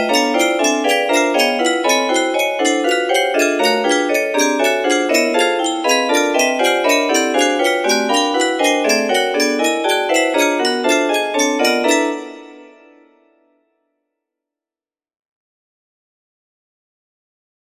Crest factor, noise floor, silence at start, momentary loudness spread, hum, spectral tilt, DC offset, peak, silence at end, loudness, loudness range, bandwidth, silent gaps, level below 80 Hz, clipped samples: 16 dB; under -90 dBFS; 0 s; 2 LU; none; -1 dB/octave; under 0.1%; 0 dBFS; 5 s; -15 LUFS; 4 LU; 15.5 kHz; none; -68 dBFS; under 0.1%